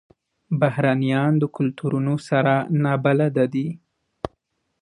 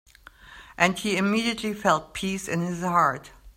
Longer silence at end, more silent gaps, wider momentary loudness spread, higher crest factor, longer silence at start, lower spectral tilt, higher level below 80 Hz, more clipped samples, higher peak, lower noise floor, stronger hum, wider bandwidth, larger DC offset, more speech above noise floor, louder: first, 0.55 s vs 0.05 s; neither; first, 15 LU vs 8 LU; second, 16 dB vs 24 dB; about the same, 0.5 s vs 0.45 s; first, -8.5 dB/octave vs -4.5 dB/octave; about the same, -58 dBFS vs -54 dBFS; neither; about the same, -4 dBFS vs -2 dBFS; first, -72 dBFS vs -49 dBFS; neither; second, 10.5 kHz vs 16 kHz; neither; first, 52 dB vs 25 dB; first, -21 LUFS vs -25 LUFS